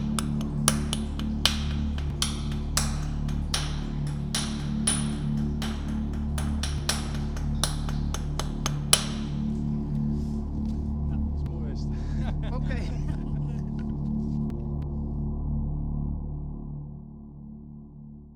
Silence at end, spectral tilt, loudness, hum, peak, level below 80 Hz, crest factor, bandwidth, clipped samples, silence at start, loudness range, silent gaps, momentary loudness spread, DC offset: 0 s; -4.5 dB/octave; -29 LUFS; none; -4 dBFS; -34 dBFS; 24 dB; over 20 kHz; under 0.1%; 0 s; 4 LU; none; 10 LU; under 0.1%